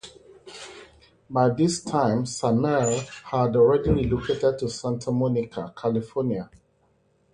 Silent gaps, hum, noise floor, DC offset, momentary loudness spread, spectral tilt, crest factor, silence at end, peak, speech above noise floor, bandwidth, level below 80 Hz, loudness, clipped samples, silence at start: none; none; -65 dBFS; under 0.1%; 21 LU; -6 dB/octave; 18 dB; 0.9 s; -6 dBFS; 42 dB; 11 kHz; -46 dBFS; -24 LUFS; under 0.1%; 0.05 s